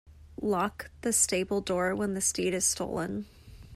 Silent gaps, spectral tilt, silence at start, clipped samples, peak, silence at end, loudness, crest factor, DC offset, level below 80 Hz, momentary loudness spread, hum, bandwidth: none; -3 dB/octave; 0.05 s; under 0.1%; -14 dBFS; 0 s; -29 LUFS; 18 dB; under 0.1%; -54 dBFS; 11 LU; none; 16 kHz